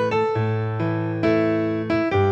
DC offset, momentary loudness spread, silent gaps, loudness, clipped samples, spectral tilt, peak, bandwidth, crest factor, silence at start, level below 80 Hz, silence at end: under 0.1%; 4 LU; none; -22 LUFS; under 0.1%; -8.5 dB/octave; -8 dBFS; 7.4 kHz; 12 dB; 0 s; -54 dBFS; 0 s